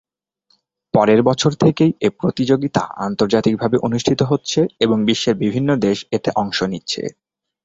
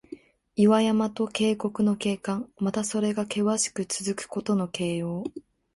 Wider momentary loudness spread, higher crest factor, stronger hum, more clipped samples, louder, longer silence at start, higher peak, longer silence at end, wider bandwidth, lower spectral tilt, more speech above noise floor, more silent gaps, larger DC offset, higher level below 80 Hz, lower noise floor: second, 7 LU vs 12 LU; about the same, 16 dB vs 18 dB; neither; neither; first, -17 LUFS vs -26 LUFS; first, 0.95 s vs 0.1 s; first, -2 dBFS vs -8 dBFS; first, 0.55 s vs 0.35 s; second, 8 kHz vs 11.5 kHz; about the same, -6 dB/octave vs -5 dB/octave; first, 47 dB vs 21 dB; neither; neither; first, -52 dBFS vs -64 dBFS; first, -64 dBFS vs -46 dBFS